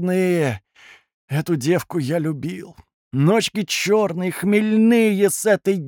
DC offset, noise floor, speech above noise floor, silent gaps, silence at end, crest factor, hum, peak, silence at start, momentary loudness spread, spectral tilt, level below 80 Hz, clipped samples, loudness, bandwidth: under 0.1%; -49 dBFS; 31 dB; 1.14-1.28 s, 2.94-3.11 s; 0 s; 14 dB; none; -6 dBFS; 0 s; 11 LU; -5.5 dB/octave; -64 dBFS; under 0.1%; -19 LUFS; 18 kHz